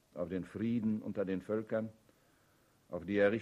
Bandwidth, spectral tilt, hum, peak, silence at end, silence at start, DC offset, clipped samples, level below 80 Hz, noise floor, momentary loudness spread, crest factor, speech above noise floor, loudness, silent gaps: 11 kHz; -8 dB/octave; none; -18 dBFS; 0 s; 0.15 s; under 0.1%; under 0.1%; -70 dBFS; -70 dBFS; 12 LU; 20 dB; 35 dB; -37 LUFS; none